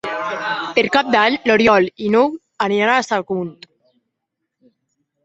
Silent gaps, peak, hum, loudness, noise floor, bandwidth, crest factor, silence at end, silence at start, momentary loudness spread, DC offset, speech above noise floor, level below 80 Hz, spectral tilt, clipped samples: none; 0 dBFS; none; -17 LUFS; -78 dBFS; 8 kHz; 18 dB; 1.7 s; 0.05 s; 10 LU; under 0.1%; 62 dB; -56 dBFS; -4.5 dB/octave; under 0.1%